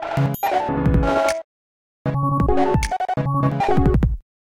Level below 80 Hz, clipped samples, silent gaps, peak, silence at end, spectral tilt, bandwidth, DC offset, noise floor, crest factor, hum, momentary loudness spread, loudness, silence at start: -28 dBFS; under 0.1%; 1.44-2.05 s; -6 dBFS; 0.25 s; -7 dB/octave; 16 kHz; under 0.1%; under -90 dBFS; 14 dB; none; 5 LU; -20 LUFS; 0 s